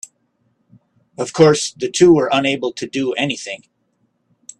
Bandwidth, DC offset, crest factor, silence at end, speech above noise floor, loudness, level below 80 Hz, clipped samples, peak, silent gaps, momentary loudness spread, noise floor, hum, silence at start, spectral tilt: 11.5 kHz; under 0.1%; 18 dB; 1.05 s; 50 dB; -16 LUFS; -58 dBFS; under 0.1%; 0 dBFS; none; 16 LU; -65 dBFS; none; 1.2 s; -4.5 dB/octave